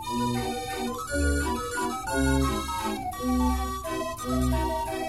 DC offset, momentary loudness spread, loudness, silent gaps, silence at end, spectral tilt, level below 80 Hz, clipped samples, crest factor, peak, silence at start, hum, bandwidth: 0.2%; 6 LU; -28 LUFS; none; 0 s; -5 dB/octave; -34 dBFS; under 0.1%; 14 dB; -12 dBFS; 0 s; none; 16 kHz